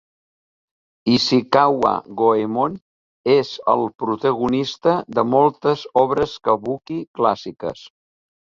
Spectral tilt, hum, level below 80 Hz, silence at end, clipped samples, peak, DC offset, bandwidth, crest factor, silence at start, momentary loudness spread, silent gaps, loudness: -6 dB/octave; none; -56 dBFS; 0.7 s; under 0.1%; -2 dBFS; under 0.1%; 7.6 kHz; 18 dB; 1.05 s; 11 LU; 2.82-3.24 s, 7.08-7.14 s; -19 LUFS